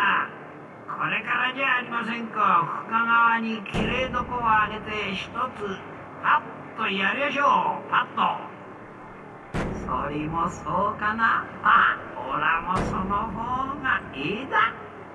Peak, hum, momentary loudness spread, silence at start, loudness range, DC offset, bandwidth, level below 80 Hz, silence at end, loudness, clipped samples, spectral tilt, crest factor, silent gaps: -6 dBFS; none; 16 LU; 0 s; 3 LU; under 0.1%; 11 kHz; -48 dBFS; 0 s; -24 LUFS; under 0.1%; -5.5 dB/octave; 20 dB; none